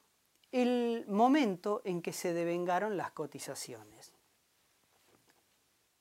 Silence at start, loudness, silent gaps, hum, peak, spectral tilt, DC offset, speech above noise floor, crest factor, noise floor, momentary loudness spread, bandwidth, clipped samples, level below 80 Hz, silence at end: 0.55 s; -33 LUFS; none; none; -16 dBFS; -5 dB/octave; under 0.1%; 40 dB; 20 dB; -74 dBFS; 14 LU; 16 kHz; under 0.1%; -88 dBFS; 1.95 s